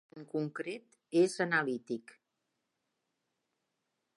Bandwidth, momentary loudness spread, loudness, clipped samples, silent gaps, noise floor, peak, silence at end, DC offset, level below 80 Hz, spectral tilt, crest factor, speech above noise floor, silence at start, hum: 11.5 kHz; 13 LU; -34 LUFS; under 0.1%; none; -84 dBFS; -18 dBFS; 2.15 s; under 0.1%; under -90 dBFS; -5.5 dB/octave; 20 dB; 51 dB; 0.15 s; none